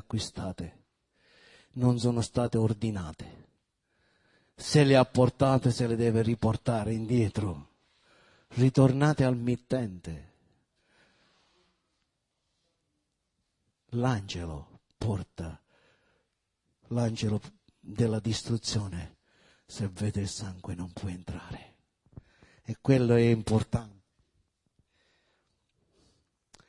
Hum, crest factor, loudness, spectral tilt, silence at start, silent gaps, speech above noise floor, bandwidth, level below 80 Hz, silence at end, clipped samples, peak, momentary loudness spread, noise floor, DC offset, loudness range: none; 22 dB; -28 LUFS; -6.5 dB/octave; 0.1 s; none; 52 dB; 11.5 kHz; -56 dBFS; 2.8 s; under 0.1%; -8 dBFS; 19 LU; -80 dBFS; under 0.1%; 11 LU